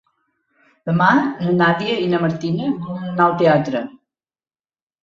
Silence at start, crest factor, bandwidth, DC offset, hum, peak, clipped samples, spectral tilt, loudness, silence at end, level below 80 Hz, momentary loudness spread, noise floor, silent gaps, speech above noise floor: 0.85 s; 18 dB; 7.2 kHz; under 0.1%; none; -2 dBFS; under 0.1%; -7.5 dB/octave; -18 LUFS; 1.1 s; -60 dBFS; 11 LU; under -90 dBFS; none; over 73 dB